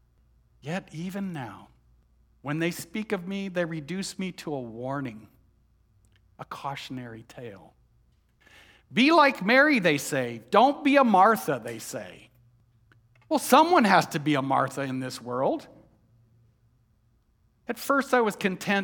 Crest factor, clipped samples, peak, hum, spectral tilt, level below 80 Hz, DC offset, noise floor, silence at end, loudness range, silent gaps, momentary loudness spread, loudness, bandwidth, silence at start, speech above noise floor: 22 dB; under 0.1%; -4 dBFS; none; -5 dB/octave; -66 dBFS; under 0.1%; -66 dBFS; 0 s; 16 LU; none; 20 LU; -25 LUFS; 19 kHz; 0.65 s; 41 dB